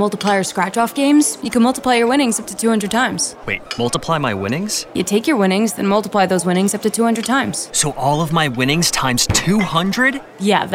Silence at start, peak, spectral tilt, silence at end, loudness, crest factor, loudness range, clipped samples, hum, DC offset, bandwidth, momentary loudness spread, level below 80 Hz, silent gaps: 0 s; -2 dBFS; -4 dB/octave; 0 s; -16 LUFS; 16 dB; 2 LU; under 0.1%; none; under 0.1%; 17 kHz; 5 LU; -44 dBFS; none